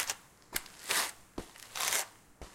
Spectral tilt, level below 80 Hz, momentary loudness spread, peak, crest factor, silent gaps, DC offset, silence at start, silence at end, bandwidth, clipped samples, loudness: 0.5 dB/octave; -60 dBFS; 16 LU; -10 dBFS; 28 dB; none; under 0.1%; 0 s; 0 s; 17 kHz; under 0.1%; -35 LUFS